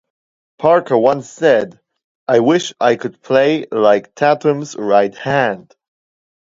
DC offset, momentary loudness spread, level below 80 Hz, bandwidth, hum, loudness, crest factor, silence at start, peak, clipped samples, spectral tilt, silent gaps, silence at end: under 0.1%; 7 LU; -60 dBFS; 7.8 kHz; none; -15 LUFS; 16 dB; 0.6 s; 0 dBFS; under 0.1%; -5.5 dB/octave; 2.04-2.26 s; 0.9 s